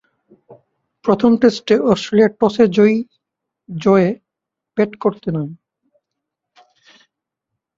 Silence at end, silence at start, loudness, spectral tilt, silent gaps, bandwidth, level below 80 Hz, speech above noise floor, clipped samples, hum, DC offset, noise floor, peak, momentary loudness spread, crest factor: 2.2 s; 1.05 s; -16 LUFS; -7 dB/octave; none; 7.6 kHz; -56 dBFS; 68 dB; under 0.1%; none; under 0.1%; -83 dBFS; -2 dBFS; 14 LU; 16 dB